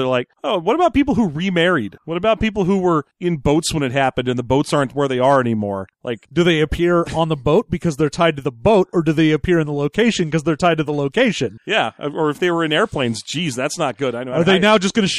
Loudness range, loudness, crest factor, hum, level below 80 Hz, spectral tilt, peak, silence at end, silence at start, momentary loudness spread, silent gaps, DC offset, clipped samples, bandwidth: 2 LU; -18 LUFS; 16 dB; none; -40 dBFS; -5.5 dB/octave; -2 dBFS; 0 s; 0 s; 7 LU; none; under 0.1%; under 0.1%; 12.5 kHz